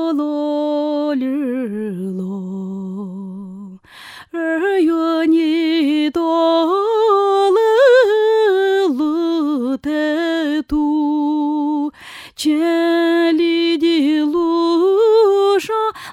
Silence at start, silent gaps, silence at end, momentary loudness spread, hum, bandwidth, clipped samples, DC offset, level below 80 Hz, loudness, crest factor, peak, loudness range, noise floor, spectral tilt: 0 s; none; 0 s; 14 LU; none; 15 kHz; under 0.1%; under 0.1%; -52 dBFS; -16 LUFS; 14 dB; -2 dBFS; 9 LU; -39 dBFS; -5.5 dB/octave